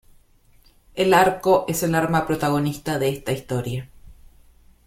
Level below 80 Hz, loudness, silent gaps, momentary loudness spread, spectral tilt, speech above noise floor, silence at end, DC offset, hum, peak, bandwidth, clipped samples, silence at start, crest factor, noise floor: -50 dBFS; -21 LUFS; none; 11 LU; -5.5 dB/octave; 34 dB; 0.75 s; under 0.1%; none; -2 dBFS; 16.5 kHz; under 0.1%; 0.95 s; 20 dB; -55 dBFS